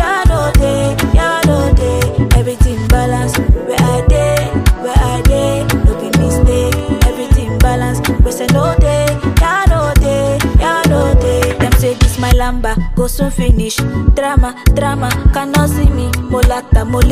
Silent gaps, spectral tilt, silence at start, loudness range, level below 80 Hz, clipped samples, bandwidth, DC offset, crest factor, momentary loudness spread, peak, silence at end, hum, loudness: none; -6 dB/octave; 0 s; 2 LU; -14 dBFS; under 0.1%; 15.5 kHz; under 0.1%; 10 dB; 3 LU; 0 dBFS; 0 s; none; -13 LUFS